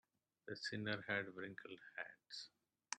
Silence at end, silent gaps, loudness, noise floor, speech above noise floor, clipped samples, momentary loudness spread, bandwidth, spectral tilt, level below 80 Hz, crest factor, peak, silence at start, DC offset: 0 s; none; -47 LUFS; -68 dBFS; 21 dB; under 0.1%; 12 LU; 10.5 kHz; -3.5 dB/octave; -90 dBFS; 26 dB; -24 dBFS; 0.45 s; under 0.1%